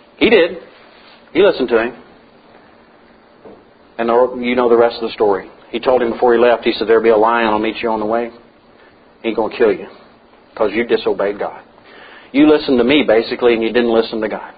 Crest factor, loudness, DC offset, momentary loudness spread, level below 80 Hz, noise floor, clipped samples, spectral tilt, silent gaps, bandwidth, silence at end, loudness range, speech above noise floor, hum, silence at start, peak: 16 dB; -15 LUFS; under 0.1%; 11 LU; -50 dBFS; -46 dBFS; under 0.1%; -9.5 dB/octave; none; 5 kHz; 0.05 s; 6 LU; 32 dB; none; 0.2 s; 0 dBFS